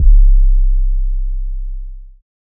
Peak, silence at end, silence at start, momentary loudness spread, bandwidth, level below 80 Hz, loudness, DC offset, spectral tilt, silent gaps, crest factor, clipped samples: 0 dBFS; 0.5 s; 0 s; 18 LU; 0.2 kHz; -12 dBFS; -18 LUFS; under 0.1%; -24 dB/octave; none; 12 dB; under 0.1%